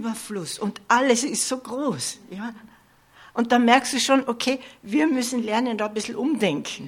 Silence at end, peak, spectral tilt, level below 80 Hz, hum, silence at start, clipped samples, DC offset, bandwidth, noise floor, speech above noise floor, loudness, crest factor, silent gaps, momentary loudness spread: 0 s; -4 dBFS; -3 dB/octave; -68 dBFS; none; 0 s; under 0.1%; under 0.1%; 16 kHz; -54 dBFS; 31 dB; -23 LUFS; 20 dB; none; 12 LU